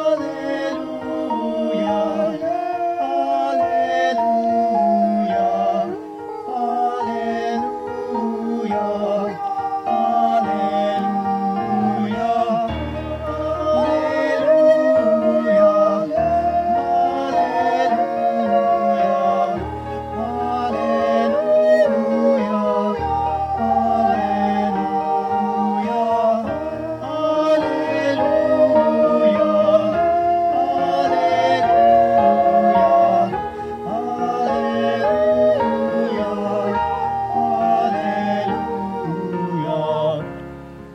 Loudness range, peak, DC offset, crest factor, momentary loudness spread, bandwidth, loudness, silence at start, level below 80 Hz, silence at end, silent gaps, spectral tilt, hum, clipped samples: 5 LU; -4 dBFS; under 0.1%; 14 dB; 10 LU; 8.6 kHz; -19 LUFS; 0 s; -46 dBFS; 0 s; none; -7 dB/octave; none; under 0.1%